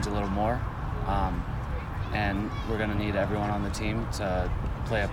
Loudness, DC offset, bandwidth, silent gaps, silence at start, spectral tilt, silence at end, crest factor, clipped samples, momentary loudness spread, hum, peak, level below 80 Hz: -30 LUFS; under 0.1%; 16.5 kHz; none; 0 s; -6.5 dB/octave; 0 s; 14 dB; under 0.1%; 5 LU; none; -14 dBFS; -34 dBFS